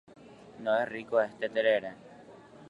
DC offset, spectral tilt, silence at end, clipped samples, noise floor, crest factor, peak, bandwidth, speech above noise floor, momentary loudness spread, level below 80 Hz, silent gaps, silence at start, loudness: under 0.1%; -5.5 dB/octave; 0 s; under 0.1%; -52 dBFS; 20 dB; -12 dBFS; 8.2 kHz; 23 dB; 19 LU; -74 dBFS; none; 0.3 s; -30 LUFS